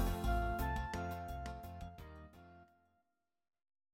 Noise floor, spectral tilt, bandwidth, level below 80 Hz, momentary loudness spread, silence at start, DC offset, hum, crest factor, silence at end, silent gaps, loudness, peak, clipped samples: -88 dBFS; -6 dB/octave; 16.5 kHz; -46 dBFS; 20 LU; 0 s; under 0.1%; none; 18 dB; 1.3 s; none; -42 LUFS; -24 dBFS; under 0.1%